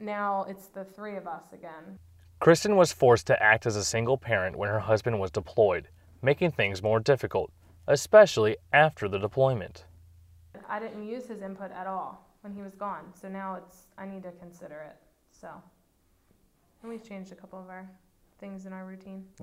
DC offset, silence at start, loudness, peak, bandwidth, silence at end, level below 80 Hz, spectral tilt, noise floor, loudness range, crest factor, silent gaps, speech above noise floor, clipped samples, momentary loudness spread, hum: under 0.1%; 0 s; -26 LUFS; -6 dBFS; 15.5 kHz; 0 s; -60 dBFS; -5 dB/octave; -67 dBFS; 23 LU; 24 dB; none; 40 dB; under 0.1%; 24 LU; none